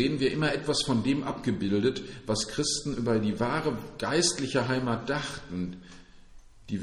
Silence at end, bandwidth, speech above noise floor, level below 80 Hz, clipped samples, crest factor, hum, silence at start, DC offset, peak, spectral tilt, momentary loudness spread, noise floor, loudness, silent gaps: 0 s; 12 kHz; 22 dB; -52 dBFS; under 0.1%; 16 dB; none; 0 s; under 0.1%; -12 dBFS; -4.5 dB/octave; 10 LU; -50 dBFS; -29 LUFS; none